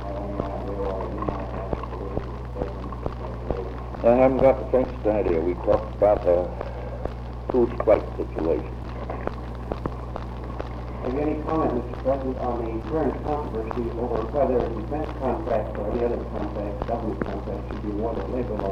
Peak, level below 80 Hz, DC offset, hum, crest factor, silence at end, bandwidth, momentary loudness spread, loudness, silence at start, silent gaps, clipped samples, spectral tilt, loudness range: -4 dBFS; -34 dBFS; under 0.1%; none; 20 dB; 0 s; 6.8 kHz; 12 LU; -26 LUFS; 0 s; none; under 0.1%; -9 dB/octave; 8 LU